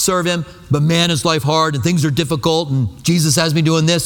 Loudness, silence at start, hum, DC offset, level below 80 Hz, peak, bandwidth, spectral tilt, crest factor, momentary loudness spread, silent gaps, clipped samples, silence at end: -16 LUFS; 0 s; none; under 0.1%; -44 dBFS; 0 dBFS; 18.5 kHz; -4.5 dB/octave; 14 dB; 5 LU; none; under 0.1%; 0 s